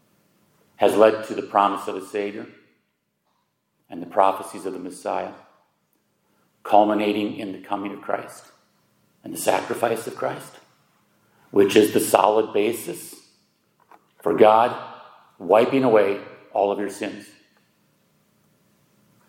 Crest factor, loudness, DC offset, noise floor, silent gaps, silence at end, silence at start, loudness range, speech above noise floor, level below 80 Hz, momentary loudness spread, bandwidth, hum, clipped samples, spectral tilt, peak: 24 dB; -21 LUFS; under 0.1%; -72 dBFS; none; 2.05 s; 0.8 s; 8 LU; 51 dB; -76 dBFS; 19 LU; 16.5 kHz; none; under 0.1%; -4.5 dB/octave; 0 dBFS